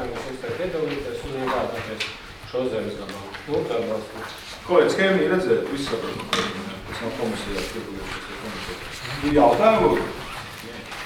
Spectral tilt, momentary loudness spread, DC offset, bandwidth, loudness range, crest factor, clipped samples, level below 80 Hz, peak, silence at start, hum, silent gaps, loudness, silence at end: -5 dB/octave; 16 LU; under 0.1%; 18 kHz; 6 LU; 20 dB; under 0.1%; -44 dBFS; -4 dBFS; 0 s; none; none; -24 LUFS; 0 s